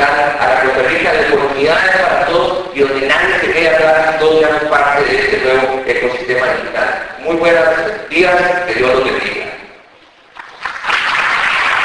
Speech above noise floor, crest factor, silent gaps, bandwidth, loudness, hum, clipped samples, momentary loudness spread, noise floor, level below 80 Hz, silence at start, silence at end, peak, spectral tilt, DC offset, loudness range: 31 dB; 12 dB; none; 10.5 kHz; -12 LUFS; none; under 0.1%; 7 LU; -44 dBFS; -42 dBFS; 0 s; 0 s; 0 dBFS; -4 dB/octave; under 0.1%; 4 LU